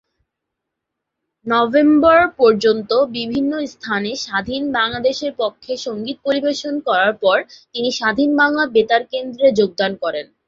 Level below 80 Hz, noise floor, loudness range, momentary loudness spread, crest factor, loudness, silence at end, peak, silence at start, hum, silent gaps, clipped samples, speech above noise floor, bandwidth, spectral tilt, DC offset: -54 dBFS; -80 dBFS; 5 LU; 11 LU; 16 dB; -17 LUFS; 0.25 s; -2 dBFS; 1.45 s; none; none; under 0.1%; 63 dB; 7.6 kHz; -4.5 dB/octave; under 0.1%